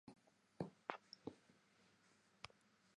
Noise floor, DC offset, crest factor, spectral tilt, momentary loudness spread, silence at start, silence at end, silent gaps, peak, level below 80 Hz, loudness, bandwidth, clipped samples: -76 dBFS; under 0.1%; 34 dB; -5.5 dB/octave; 10 LU; 0.05 s; 0.5 s; none; -24 dBFS; -86 dBFS; -55 LUFS; 10.5 kHz; under 0.1%